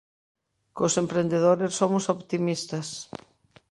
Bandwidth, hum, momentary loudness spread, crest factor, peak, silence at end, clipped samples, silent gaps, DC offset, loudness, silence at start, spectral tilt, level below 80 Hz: 11.5 kHz; none; 17 LU; 20 dB; -8 dBFS; 0.65 s; under 0.1%; none; under 0.1%; -25 LUFS; 0.75 s; -5 dB/octave; -68 dBFS